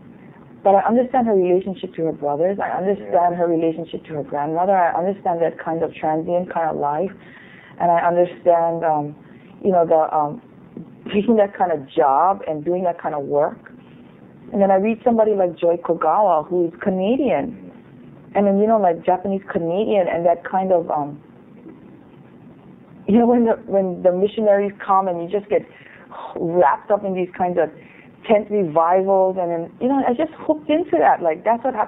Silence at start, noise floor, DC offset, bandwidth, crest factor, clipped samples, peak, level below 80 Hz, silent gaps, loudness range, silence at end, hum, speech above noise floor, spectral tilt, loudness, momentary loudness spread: 0.2 s; -44 dBFS; under 0.1%; 4 kHz; 18 dB; under 0.1%; -2 dBFS; -60 dBFS; none; 3 LU; 0 s; none; 26 dB; -11 dB/octave; -19 LUFS; 9 LU